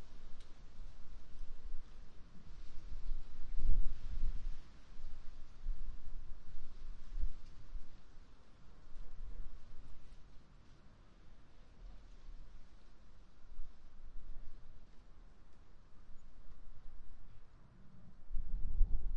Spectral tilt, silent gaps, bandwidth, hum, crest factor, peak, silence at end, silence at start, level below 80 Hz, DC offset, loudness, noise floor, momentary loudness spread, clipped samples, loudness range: -6.5 dB/octave; none; 1.9 kHz; none; 18 dB; -16 dBFS; 0 s; 0 s; -42 dBFS; under 0.1%; -52 LUFS; -58 dBFS; 19 LU; under 0.1%; 15 LU